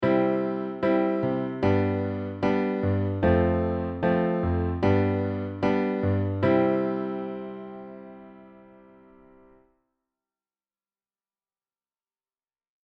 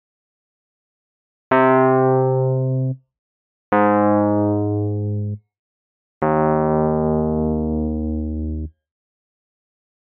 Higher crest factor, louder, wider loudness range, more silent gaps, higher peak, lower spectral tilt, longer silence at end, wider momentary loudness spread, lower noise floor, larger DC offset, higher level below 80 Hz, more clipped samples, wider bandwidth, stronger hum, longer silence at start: about the same, 18 dB vs 16 dB; second, -26 LUFS vs -19 LUFS; first, 10 LU vs 3 LU; second, none vs 3.19-3.72 s, 5.59-6.21 s; second, -10 dBFS vs -4 dBFS; about the same, -9.5 dB/octave vs -8.5 dB/octave; first, 4.35 s vs 1.35 s; about the same, 12 LU vs 11 LU; about the same, under -90 dBFS vs under -90 dBFS; neither; second, -48 dBFS vs -36 dBFS; neither; first, 6.2 kHz vs 3.9 kHz; neither; second, 0 s vs 1.5 s